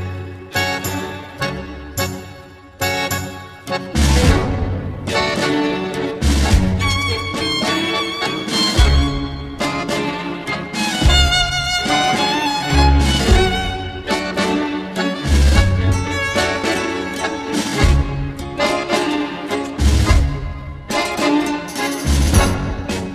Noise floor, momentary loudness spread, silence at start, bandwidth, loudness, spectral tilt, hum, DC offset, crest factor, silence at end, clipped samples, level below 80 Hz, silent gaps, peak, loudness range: -38 dBFS; 10 LU; 0 s; 14.5 kHz; -18 LUFS; -4.5 dB/octave; none; under 0.1%; 18 dB; 0 s; under 0.1%; -22 dBFS; none; 0 dBFS; 4 LU